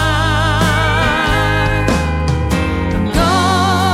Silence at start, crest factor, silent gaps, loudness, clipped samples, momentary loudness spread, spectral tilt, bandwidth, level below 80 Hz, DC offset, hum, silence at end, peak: 0 s; 14 dB; none; -14 LUFS; under 0.1%; 4 LU; -5 dB/octave; 15.5 kHz; -22 dBFS; under 0.1%; none; 0 s; 0 dBFS